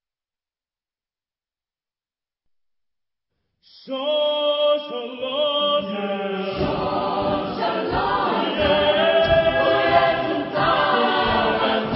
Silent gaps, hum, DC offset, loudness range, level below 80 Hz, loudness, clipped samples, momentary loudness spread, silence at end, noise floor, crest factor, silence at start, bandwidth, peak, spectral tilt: none; none; under 0.1%; 7 LU; -46 dBFS; -20 LUFS; under 0.1%; 8 LU; 0 s; under -90 dBFS; 18 dB; 3.85 s; 5.8 kHz; -4 dBFS; -9.5 dB/octave